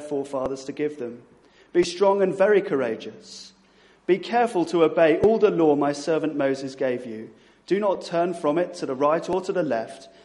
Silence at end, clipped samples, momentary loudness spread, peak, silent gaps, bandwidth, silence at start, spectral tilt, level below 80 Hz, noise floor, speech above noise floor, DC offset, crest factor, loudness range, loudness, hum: 0.2 s; under 0.1%; 16 LU; -6 dBFS; none; 11.5 kHz; 0 s; -6 dB/octave; -60 dBFS; -56 dBFS; 34 dB; under 0.1%; 16 dB; 4 LU; -23 LUFS; none